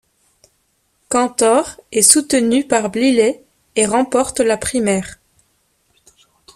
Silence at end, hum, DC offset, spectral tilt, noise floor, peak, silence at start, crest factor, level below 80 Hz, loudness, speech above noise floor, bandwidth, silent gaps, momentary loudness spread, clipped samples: 1.4 s; none; under 0.1%; -3 dB/octave; -63 dBFS; 0 dBFS; 1.1 s; 18 dB; -52 dBFS; -15 LUFS; 48 dB; 15.5 kHz; none; 11 LU; under 0.1%